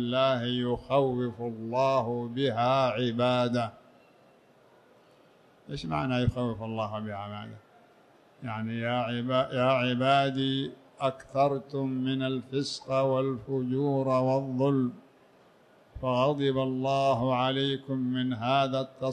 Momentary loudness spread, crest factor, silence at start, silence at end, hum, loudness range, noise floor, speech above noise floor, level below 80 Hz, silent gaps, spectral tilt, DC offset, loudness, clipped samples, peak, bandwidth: 9 LU; 16 dB; 0 s; 0 s; none; 6 LU; -60 dBFS; 32 dB; -56 dBFS; none; -7 dB/octave; under 0.1%; -29 LUFS; under 0.1%; -12 dBFS; 9.8 kHz